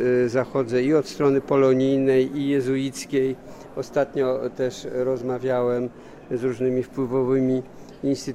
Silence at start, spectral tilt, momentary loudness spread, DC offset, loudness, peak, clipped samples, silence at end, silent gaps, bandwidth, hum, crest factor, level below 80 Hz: 0 s; -6.5 dB/octave; 9 LU; under 0.1%; -23 LUFS; -8 dBFS; under 0.1%; 0 s; none; 13 kHz; none; 14 dB; -56 dBFS